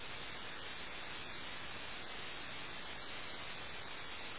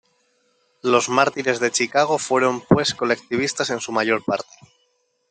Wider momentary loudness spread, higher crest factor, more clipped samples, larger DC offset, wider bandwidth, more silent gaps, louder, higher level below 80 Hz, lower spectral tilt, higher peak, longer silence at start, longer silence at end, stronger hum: second, 1 LU vs 6 LU; second, 12 dB vs 20 dB; neither; first, 0.4% vs under 0.1%; second, 4 kHz vs 9.6 kHz; neither; second, -46 LUFS vs -20 LUFS; about the same, -64 dBFS vs -60 dBFS; second, -0.5 dB/octave vs -3.5 dB/octave; second, -34 dBFS vs -2 dBFS; second, 0 s vs 0.85 s; second, 0 s vs 0.9 s; neither